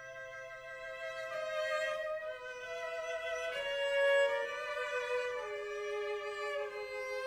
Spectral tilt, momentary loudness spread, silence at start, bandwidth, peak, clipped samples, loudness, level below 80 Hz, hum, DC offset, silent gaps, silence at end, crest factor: -1 dB/octave; 13 LU; 0 s; 14 kHz; -20 dBFS; under 0.1%; -37 LUFS; -72 dBFS; none; under 0.1%; none; 0 s; 16 dB